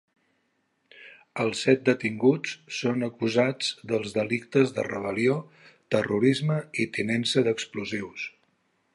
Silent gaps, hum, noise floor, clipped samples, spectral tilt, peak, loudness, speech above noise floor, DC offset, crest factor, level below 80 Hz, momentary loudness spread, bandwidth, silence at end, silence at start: none; none; -73 dBFS; under 0.1%; -5.5 dB/octave; -6 dBFS; -26 LUFS; 47 dB; under 0.1%; 20 dB; -68 dBFS; 9 LU; 11.5 kHz; 0.65 s; 0.95 s